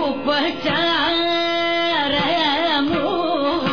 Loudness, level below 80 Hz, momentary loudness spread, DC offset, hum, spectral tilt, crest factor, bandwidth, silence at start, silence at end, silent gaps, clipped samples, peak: -19 LUFS; -50 dBFS; 3 LU; 0.9%; none; -5 dB/octave; 12 dB; 5.4 kHz; 0 s; 0 s; none; under 0.1%; -6 dBFS